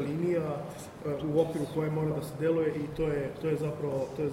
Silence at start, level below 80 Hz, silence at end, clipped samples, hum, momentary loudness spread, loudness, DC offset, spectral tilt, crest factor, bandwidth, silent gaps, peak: 0 s; -56 dBFS; 0 s; under 0.1%; none; 7 LU; -32 LUFS; under 0.1%; -7.5 dB/octave; 16 dB; 16 kHz; none; -14 dBFS